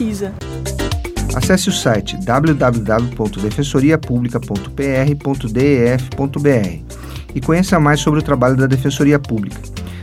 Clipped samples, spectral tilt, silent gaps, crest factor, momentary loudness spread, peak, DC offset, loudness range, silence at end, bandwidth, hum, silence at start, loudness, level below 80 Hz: under 0.1%; -6 dB/octave; none; 16 dB; 11 LU; 0 dBFS; under 0.1%; 2 LU; 0 s; 16 kHz; none; 0 s; -16 LUFS; -30 dBFS